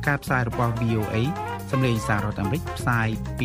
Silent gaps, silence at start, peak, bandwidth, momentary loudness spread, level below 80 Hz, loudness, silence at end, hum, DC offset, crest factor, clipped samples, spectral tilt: none; 0 s; -8 dBFS; 15.5 kHz; 4 LU; -40 dBFS; -25 LUFS; 0 s; none; under 0.1%; 18 dB; under 0.1%; -6.5 dB/octave